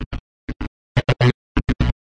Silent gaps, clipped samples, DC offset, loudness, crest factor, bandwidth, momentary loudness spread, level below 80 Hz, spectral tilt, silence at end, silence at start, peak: 0.06-0.11 s, 0.20-0.47 s, 0.56-0.60 s, 0.68-0.95 s, 1.34-1.55 s; under 0.1%; under 0.1%; -21 LUFS; 18 dB; 8 kHz; 16 LU; -28 dBFS; -7.5 dB/octave; 0.25 s; 0 s; -4 dBFS